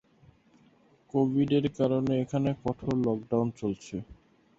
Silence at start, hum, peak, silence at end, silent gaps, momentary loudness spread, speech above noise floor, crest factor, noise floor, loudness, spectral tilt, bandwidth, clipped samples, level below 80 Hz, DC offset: 1.15 s; none; -14 dBFS; 0.45 s; none; 9 LU; 34 dB; 16 dB; -62 dBFS; -29 LUFS; -8 dB/octave; 7.8 kHz; under 0.1%; -58 dBFS; under 0.1%